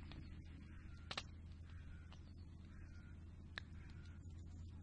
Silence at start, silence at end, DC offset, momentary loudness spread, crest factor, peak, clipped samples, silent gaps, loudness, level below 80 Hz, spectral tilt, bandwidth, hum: 0 s; 0 s; under 0.1%; 9 LU; 26 dB; -28 dBFS; under 0.1%; none; -56 LUFS; -60 dBFS; -5 dB/octave; 9.6 kHz; none